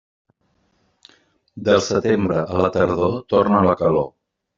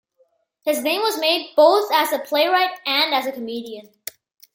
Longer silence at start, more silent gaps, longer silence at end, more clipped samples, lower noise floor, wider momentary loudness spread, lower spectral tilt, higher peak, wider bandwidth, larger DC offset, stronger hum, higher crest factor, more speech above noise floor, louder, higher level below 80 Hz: first, 1.55 s vs 0.65 s; neither; second, 0.5 s vs 0.75 s; neither; about the same, -65 dBFS vs -63 dBFS; second, 6 LU vs 19 LU; first, -5.5 dB/octave vs -1 dB/octave; about the same, -2 dBFS vs -2 dBFS; second, 7.6 kHz vs 17 kHz; neither; neither; about the same, 18 dB vs 18 dB; about the same, 47 dB vs 44 dB; about the same, -19 LUFS vs -19 LUFS; first, -52 dBFS vs -76 dBFS